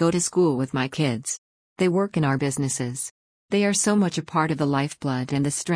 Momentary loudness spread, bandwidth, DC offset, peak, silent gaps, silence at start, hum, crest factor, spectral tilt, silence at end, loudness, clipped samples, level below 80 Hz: 8 LU; 10.5 kHz; under 0.1%; -8 dBFS; 1.38-1.76 s, 3.11-3.48 s; 0 s; none; 16 dB; -5 dB/octave; 0 s; -24 LUFS; under 0.1%; -60 dBFS